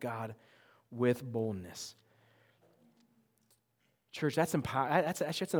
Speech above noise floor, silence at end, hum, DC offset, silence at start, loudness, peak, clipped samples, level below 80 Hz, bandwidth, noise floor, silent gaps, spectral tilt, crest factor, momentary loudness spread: 43 dB; 0 s; none; under 0.1%; 0 s; -34 LUFS; -14 dBFS; under 0.1%; -72 dBFS; over 20 kHz; -77 dBFS; none; -5.5 dB/octave; 24 dB; 16 LU